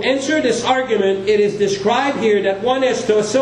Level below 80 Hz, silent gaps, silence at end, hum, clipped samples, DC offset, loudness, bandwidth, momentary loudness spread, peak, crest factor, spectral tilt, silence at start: -52 dBFS; none; 0 s; none; under 0.1%; under 0.1%; -16 LUFS; 10.5 kHz; 1 LU; -2 dBFS; 14 dB; -4 dB/octave; 0 s